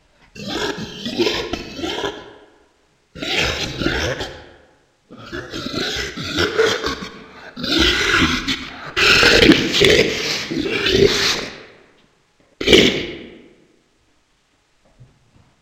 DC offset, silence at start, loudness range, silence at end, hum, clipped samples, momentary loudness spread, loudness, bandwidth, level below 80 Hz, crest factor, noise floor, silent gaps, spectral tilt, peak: under 0.1%; 0.35 s; 10 LU; 0.6 s; none; under 0.1%; 18 LU; -17 LUFS; 16 kHz; -38 dBFS; 20 dB; -61 dBFS; none; -3.5 dB/octave; 0 dBFS